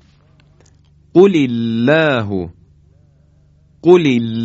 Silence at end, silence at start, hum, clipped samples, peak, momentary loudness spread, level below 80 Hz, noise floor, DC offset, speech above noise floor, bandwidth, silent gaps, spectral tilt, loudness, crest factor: 0 s; 1.15 s; none; under 0.1%; 0 dBFS; 11 LU; -48 dBFS; -50 dBFS; under 0.1%; 38 dB; 7.8 kHz; none; -7.5 dB/octave; -13 LUFS; 16 dB